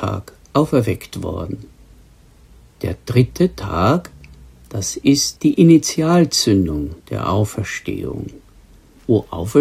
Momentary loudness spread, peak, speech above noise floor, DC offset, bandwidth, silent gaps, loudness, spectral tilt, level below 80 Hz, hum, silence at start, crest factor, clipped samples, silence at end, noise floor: 15 LU; 0 dBFS; 30 dB; under 0.1%; 15.5 kHz; none; -18 LUFS; -5.5 dB/octave; -40 dBFS; none; 0 s; 18 dB; under 0.1%; 0 s; -47 dBFS